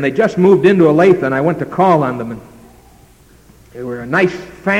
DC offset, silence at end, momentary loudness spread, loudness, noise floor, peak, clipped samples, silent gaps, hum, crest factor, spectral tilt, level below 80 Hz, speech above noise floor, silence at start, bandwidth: under 0.1%; 0 s; 17 LU; -13 LUFS; -45 dBFS; 0 dBFS; under 0.1%; none; none; 14 dB; -7.5 dB/octave; -48 dBFS; 32 dB; 0 s; 11 kHz